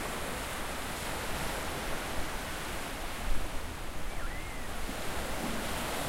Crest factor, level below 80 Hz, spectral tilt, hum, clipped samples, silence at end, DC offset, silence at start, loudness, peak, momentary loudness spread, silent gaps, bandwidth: 16 dB; -40 dBFS; -3.5 dB/octave; none; under 0.1%; 0 s; under 0.1%; 0 s; -37 LUFS; -16 dBFS; 5 LU; none; 16 kHz